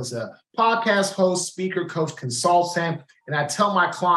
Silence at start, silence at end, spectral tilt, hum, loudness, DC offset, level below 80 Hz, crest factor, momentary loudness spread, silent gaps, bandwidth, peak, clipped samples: 0 s; 0 s; -4 dB/octave; none; -22 LUFS; under 0.1%; -74 dBFS; 16 dB; 9 LU; none; 13 kHz; -6 dBFS; under 0.1%